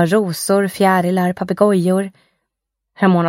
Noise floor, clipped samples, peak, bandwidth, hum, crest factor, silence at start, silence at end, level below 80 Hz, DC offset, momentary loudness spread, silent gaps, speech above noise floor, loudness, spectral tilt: -78 dBFS; under 0.1%; 0 dBFS; 16.5 kHz; none; 16 dB; 0 s; 0 s; -62 dBFS; under 0.1%; 5 LU; none; 63 dB; -16 LUFS; -6 dB/octave